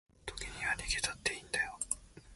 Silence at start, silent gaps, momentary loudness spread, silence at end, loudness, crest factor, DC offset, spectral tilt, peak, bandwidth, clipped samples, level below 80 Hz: 0.25 s; none; 9 LU; 0 s; -36 LUFS; 24 dB; under 0.1%; -0.5 dB/octave; -16 dBFS; 12 kHz; under 0.1%; -52 dBFS